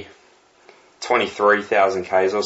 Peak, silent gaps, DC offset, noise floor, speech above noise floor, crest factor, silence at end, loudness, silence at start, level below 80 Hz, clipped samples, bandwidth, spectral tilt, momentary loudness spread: -4 dBFS; none; under 0.1%; -54 dBFS; 36 dB; 18 dB; 0 s; -19 LUFS; 0 s; -64 dBFS; under 0.1%; 8 kHz; -4 dB/octave; 5 LU